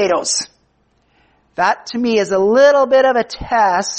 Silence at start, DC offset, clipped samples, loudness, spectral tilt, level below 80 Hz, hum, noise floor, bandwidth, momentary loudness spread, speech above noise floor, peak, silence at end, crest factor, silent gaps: 0 s; under 0.1%; under 0.1%; -14 LUFS; -3 dB/octave; -46 dBFS; none; -59 dBFS; 8.8 kHz; 9 LU; 45 dB; -2 dBFS; 0 s; 14 dB; none